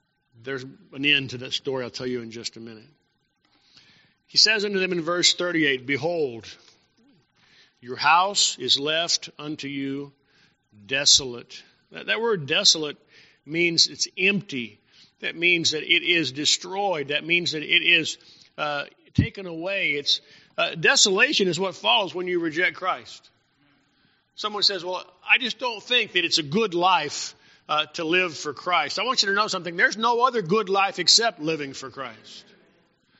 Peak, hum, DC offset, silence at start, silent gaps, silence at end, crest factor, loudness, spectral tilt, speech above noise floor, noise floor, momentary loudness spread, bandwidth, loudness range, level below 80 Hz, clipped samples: -2 dBFS; none; under 0.1%; 0.45 s; none; 0.8 s; 22 dB; -22 LUFS; -1 dB/octave; 45 dB; -69 dBFS; 17 LU; 8 kHz; 4 LU; -58 dBFS; under 0.1%